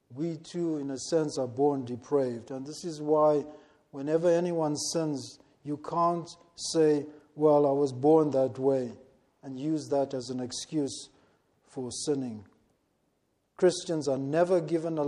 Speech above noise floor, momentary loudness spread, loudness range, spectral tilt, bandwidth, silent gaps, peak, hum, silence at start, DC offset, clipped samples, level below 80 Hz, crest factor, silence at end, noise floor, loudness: 46 dB; 15 LU; 7 LU; -5.5 dB/octave; 12 kHz; none; -12 dBFS; none; 0.1 s; under 0.1%; under 0.1%; -74 dBFS; 18 dB; 0 s; -75 dBFS; -29 LUFS